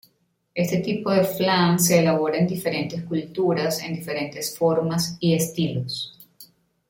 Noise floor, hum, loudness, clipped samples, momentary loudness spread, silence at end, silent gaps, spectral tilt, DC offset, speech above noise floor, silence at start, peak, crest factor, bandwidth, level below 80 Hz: -67 dBFS; none; -23 LUFS; under 0.1%; 11 LU; 0.45 s; none; -5 dB/octave; under 0.1%; 45 dB; 0.55 s; -4 dBFS; 18 dB; 17 kHz; -60 dBFS